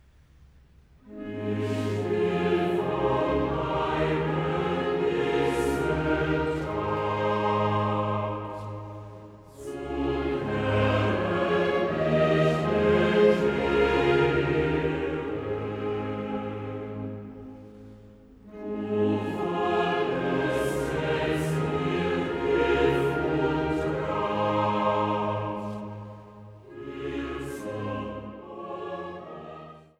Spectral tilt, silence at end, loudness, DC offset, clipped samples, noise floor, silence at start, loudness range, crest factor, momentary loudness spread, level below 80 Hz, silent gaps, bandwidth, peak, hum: -7 dB/octave; 0.2 s; -27 LUFS; under 0.1%; under 0.1%; -55 dBFS; 1.05 s; 10 LU; 18 dB; 17 LU; -46 dBFS; none; 14 kHz; -10 dBFS; none